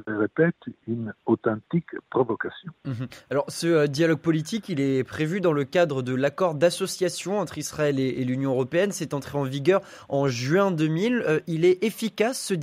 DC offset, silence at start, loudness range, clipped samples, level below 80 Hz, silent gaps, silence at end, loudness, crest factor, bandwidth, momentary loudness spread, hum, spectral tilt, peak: under 0.1%; 0.05 s; 3 LU; under 0.1%; -64 dBFS; none; 0 s; -25 LUFS; 18 dB; 15.5 kHz; 8 LU; none; -5.5 dB/octave; -8 dBFS